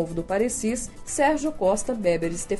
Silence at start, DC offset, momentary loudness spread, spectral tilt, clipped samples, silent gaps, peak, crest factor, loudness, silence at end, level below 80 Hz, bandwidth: 0 s; under 0.1%; 5 LU; -4.5 dB/octave; under 0.1%; none; -10 dBFS; 16 dB; -25 LUFS; 0 s; -42 dBFS; 11.5 kHz